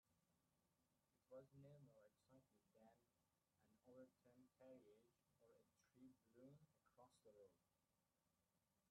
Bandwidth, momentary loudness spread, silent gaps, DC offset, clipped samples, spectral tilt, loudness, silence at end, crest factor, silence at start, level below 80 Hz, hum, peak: 4.3 kHz; 3 LU; none; under 0.1%; under 0.1%; -7 dB/octave; -68 LUFS; 0 s; 20 dB; 0.05 s; under -90 dBFS; none; -54 dBFS